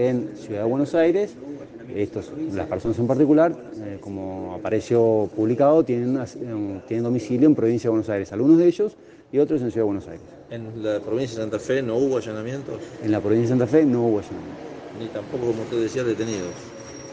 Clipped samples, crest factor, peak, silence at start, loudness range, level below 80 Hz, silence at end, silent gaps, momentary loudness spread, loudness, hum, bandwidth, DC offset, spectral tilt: under 0.1%; 18 dB; -6 dBFS; 0 s; 5 LU; -58 dBFS; 0 s; none; 17 LU; -22 LUFS; none; 8.4 kHz; under 0.1%; -7.5 dB/octave